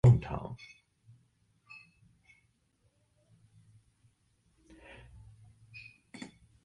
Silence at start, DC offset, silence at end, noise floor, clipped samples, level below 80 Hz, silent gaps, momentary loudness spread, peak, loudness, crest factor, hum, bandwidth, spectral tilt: 0.05 s; under 0.1%; 6.1 s; -73 dBFS; under 0.1%; -54 dBFS; none; 23 LU; -12 dBFS; -33 LUFS; 24 dB; none; 8.8 kHz; -8.5 dB/octave